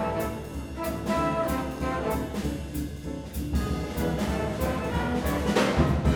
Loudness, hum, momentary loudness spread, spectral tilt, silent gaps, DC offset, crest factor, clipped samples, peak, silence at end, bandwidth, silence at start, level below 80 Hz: -29 LUFS; none; 10 LU; -6 dB/octave; none; under 0.1%; 18 dB; under 0.1%; -10 dBFS; 0 s; 19.5 kHz; 0 s; -36 dBFS